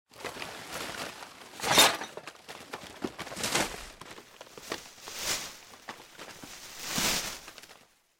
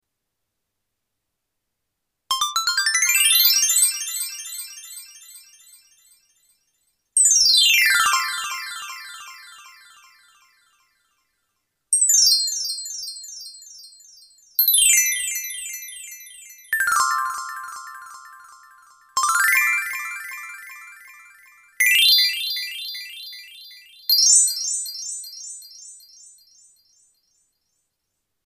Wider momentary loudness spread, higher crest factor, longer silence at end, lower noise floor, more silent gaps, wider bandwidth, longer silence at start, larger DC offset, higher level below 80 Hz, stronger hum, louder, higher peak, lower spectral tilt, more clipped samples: about the same, 22 LU vs 24 LU; about the same, 24 dB vs 20 dB; second, 0.45 s vs 2.5 s; second, -58 dBFS vs -80 dBFS; neither; about the same, 17 kHz vs 16 kHz; second, 0.15 s vs 2.3 s; neither; first, -60 dBFS vs -68 dBFS; neither; second, -30 LUFS vs -17 LUFS; second, -10 dBFS vs -2 dBFS; first, -1 dB/octave vs 6 dB/octave; neither